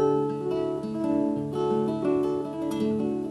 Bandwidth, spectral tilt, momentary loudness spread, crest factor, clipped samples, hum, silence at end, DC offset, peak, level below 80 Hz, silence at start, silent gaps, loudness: 12.5 kHz; -8 dB/octave; 4 LU; 12 dB; under 0.1%; none; 0 s; under 0.1%; -14 dBFS; -60 dBFS; 0 s; none; -27 LUFS